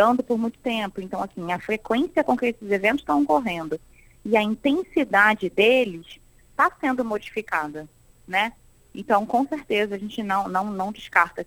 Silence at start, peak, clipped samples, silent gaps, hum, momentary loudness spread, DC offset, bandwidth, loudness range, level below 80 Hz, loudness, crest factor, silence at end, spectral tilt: 0 s; -2 dBFS; under 0.1%; none; none; 12 LU; under 0.1%; 17.5 kHz; 4 LU; -56 dBFS; -23 LUFS; 22 dB; 0.05 s; -5.5 dB/octave